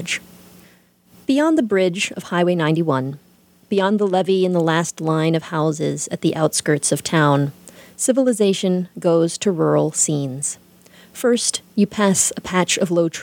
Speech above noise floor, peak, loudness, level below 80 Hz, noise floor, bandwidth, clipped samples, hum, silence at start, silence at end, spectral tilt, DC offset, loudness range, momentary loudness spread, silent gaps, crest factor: 34 dB; -2 dBFS; -19 LUFS; -62 dBFS; -53 dBFS; 19 kHz; under 0.1%; none; 0 s; 0 s; -4.5 dB/octave; under 0.1%; 1 LU; 7 LU; none; 18 dB